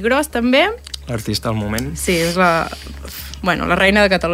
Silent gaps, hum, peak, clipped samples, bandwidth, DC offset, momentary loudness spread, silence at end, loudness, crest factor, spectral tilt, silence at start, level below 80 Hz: none; none; -2 dBFS; under 0.1%; 16 kHz; under 0.1%; 16 LU; 0 s; -16 LUFS; 16 dB; -4.5 dB/octave; 0 s; -34 dBFS